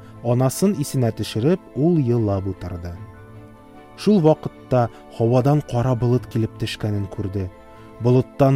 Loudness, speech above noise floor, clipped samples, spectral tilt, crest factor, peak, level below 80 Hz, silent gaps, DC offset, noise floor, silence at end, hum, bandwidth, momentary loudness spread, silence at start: -21 LUFS; 24 dB; under 0.1%; -7.5 dB/octave; 16 dB; -4 dBFS; -46 dBFS; none; under 0.1%; -43 dBFS; 0 s; none; 16 kHz; 12 LU; 0 s